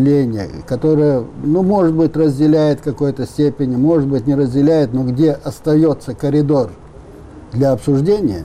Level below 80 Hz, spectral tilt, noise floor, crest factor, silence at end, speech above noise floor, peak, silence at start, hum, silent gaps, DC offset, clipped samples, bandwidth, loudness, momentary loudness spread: -42 dBFS; -9 dB/octave; -36 dBFS; 10 dB; 0 s; 22 dB; -4 dBFS; 0 s; none; none; under 0.1%; under 0.1%; 12.5 kHz; -15 LUFS; 6 LU